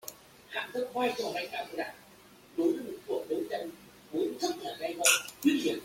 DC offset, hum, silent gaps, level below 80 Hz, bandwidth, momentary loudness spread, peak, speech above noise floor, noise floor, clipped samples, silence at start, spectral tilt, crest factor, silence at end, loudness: under 0.1%; none; none; -72 dBFS; 16.5 kHz; 13 LU; -8 dBFS; 25 dB; -56 dBFS; under 0.1%; 0.05 s; -1.5 dB/octave; 24 dB; 0 s; -32 LUFS